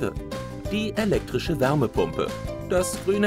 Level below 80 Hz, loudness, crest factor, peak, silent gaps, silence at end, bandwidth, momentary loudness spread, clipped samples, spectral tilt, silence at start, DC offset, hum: -40 dBFS; -26 LUFS; 16 dB; -8 dBFS; none; 0 s; 16 kHz; 10 LU; under 0.1%; -5.5 dB/octave; 0 s; under 0.1%; none